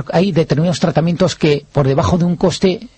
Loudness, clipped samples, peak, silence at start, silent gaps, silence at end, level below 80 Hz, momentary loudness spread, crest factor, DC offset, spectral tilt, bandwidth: -15 LUFS; under 0.1%; -2 dBFS; 0 s; none; 0.1 s; -38 dBFS; 2 LU; 12 dB; under 0.1%; -6.5 dB/octave; 8.6 kHz